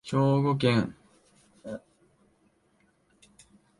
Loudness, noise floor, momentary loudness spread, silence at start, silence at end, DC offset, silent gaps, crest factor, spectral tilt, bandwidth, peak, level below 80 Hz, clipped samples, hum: -26 LUFS; -68 dBFS; 19 LU; 0.05 s; 2 s; under 0.1%; none; 20 dB; -7.5 dB/octave; 11.5 kHz; -10 dBFS; -64 dBFS; under 0.1%; none